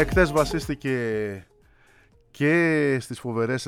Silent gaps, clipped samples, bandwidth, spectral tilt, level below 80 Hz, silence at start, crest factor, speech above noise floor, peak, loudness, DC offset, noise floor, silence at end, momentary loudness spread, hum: none; under 0.1%; 16.5 kHz; -6 dB/octave; -40 dBFS; 0 s; 20 dB; 34 dB; -6 dBFS; -24 LUFS; under 0.1%; -57 dBFS; 0 s; 10 LU; none